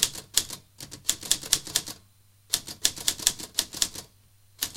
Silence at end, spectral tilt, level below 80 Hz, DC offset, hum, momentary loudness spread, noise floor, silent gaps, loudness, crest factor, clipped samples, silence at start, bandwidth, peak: 0 s; 0.5 dB/octave; -56 dBFS; under 0.1%; none; 16 LU; -59 dBFS; none; -27 LUFS; 30 dB; under 0.1%; 0 s; 17 kHz; 0 dBFS